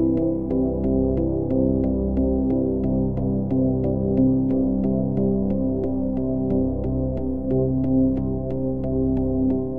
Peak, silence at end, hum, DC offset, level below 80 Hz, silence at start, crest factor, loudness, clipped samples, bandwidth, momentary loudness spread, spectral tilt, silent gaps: -8 dBFS; 0 s; none; 1%; -34 dBFS; 0 s; 14 dB; -22 LUFS; under 0.1%; 2.7 kHz; 4 LU; -13.5 dB/octave; none